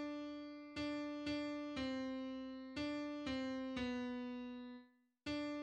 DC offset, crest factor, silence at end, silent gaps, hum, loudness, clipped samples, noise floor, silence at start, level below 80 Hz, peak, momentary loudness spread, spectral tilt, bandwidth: under 0.1%; 14 dB; 0 s; none; none; -45 LUFS; under 0.1%; -65 dBFS; 0 s; -68 dBFS; -30 dBFS; 8 LU; -5 dB/octave; 9.4 kHz